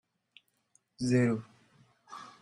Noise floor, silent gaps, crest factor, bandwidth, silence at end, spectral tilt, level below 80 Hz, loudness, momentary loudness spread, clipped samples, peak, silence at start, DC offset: -72 dBFS; none; 20 dB; 11.5 kHz; 0.15 s; -7 dB/octave; -70 dBFS; -30 LUFS; 21 LU; under 0.1%; -16 dBFS; 1 s; under 0.1%